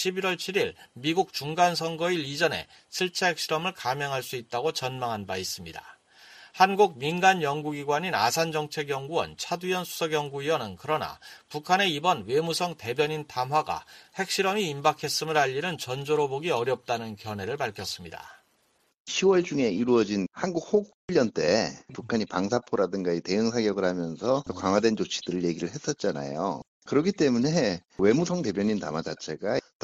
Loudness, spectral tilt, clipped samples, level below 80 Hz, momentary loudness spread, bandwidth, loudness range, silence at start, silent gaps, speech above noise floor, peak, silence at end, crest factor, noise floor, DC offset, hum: -27 LUFS; -4.5 dB/octave; under 0.1%; -64 dBFS; 9 LU; 15 kHz; 4 LU; 0 s; 18.94-19.05 s, 20.94-21.08 s, 26.67-26.82 s; 42 dB; -6 dBFS; 0.25 s; 22 dB; -69 dBFS; under 0.1%; none